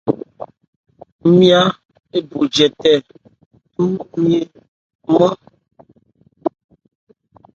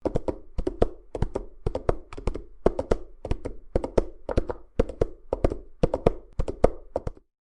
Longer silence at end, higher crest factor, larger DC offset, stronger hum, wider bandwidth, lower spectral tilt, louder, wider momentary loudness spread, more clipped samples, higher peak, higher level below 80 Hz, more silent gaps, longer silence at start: first, 1.05 s vs 0.25 s; second, 18 dB vs 26 dB; neither; neither; second, 7.8 kHz vs 10.5 kHz; second, -6 dB/octave vs -8 dB/octave; first, -16 LUFS vs -30 LUFS; first, 22 LU vs 9 LU; neither; about the same, 0 dBFS vs 0 dBFS; second, -58 dBFS vs -32 dBFS; first, 0.68-0.84 s, 1.12-1.19 s, 1.85-1.89 s, 3.46-3.51 s, 4.68-4.99 s vs none; about the same, 0.05 s vs 0 s